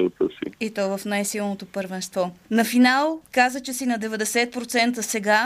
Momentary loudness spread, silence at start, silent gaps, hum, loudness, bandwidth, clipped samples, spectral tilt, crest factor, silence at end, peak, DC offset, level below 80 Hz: 11 LU; 0 s; none; none; -23 LUFS; 15.5 kHz; under 0.1%; -3.5 dB/octave; 16 dB; 0 s; -6 dBFS; under 0.1%; -64 dBFS